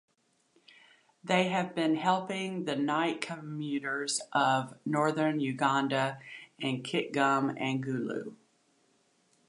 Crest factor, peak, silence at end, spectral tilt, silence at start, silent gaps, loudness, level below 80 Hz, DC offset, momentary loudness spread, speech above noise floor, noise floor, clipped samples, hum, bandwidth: 20 dB; -12 dBFS; 1.15 s; -4.5 dB/octave; 1.25 s; none; -31 LUFS; -82 dBFS; under 0.1%; 9 LU; 40 dB; -71 dBFS; under 0.1%; none; 11.5 kHz